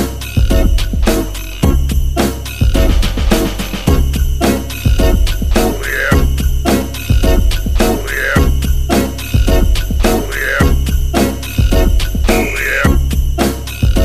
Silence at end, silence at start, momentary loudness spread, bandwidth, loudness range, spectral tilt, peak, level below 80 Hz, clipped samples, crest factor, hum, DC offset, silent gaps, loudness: 0 s; 0 s; 4 LU; 15.5 kHz; 1 LU; -5.5 dB/octave; 0 dBFS; -14 dBFS; under 0.1%; 12 dB; none; 2%; none; -14 LUFS